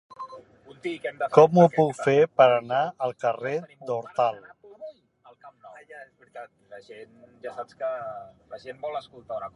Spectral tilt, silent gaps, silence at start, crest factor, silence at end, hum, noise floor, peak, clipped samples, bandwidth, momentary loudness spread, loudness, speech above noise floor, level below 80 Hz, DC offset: -7 dB/octave; none; 0.2 s; 24 dB; 0.1 s; none; -57 dBFS; -2 dBFS; under 0.1%; 11 kHz; 26 LU; -23 LUFS; 32 dB; -72 dBFS; under 0.1%